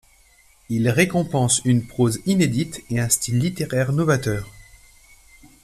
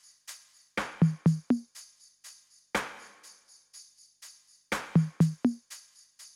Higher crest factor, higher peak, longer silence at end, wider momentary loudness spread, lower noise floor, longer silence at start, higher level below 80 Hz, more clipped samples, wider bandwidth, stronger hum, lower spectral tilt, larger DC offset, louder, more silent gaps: about the same, 20 dB vs 20 dB; first, -2 dBFS vs -12 dBFS; first, 1 s vs 0.1 s; second, 8 LU vs 24 LU; about the same, -55 dBFS vs -56 dBFS; first, 0.7 s vs 0.3 s; first, -48 dBFS vs -64 dBFS; neither; about the same, 14.5 kHz vs 14 kHz; second, none vs 50 Hz at -65 dBFS; second, -5 dB/octave vs -6.5 dB/octave; neither; first, -21 LUFS vs -30 LUFS; neither